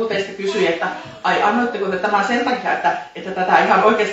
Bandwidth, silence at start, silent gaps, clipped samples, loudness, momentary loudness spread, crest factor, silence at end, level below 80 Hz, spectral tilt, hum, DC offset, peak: 8.2 kHz; 0 s; none; under 0.1%; -18 LUFS; 9 LU; 18 dB; 0 s; -60 dBFS; -4.5 dB/octave; none; under 0.1%; 0 dBFS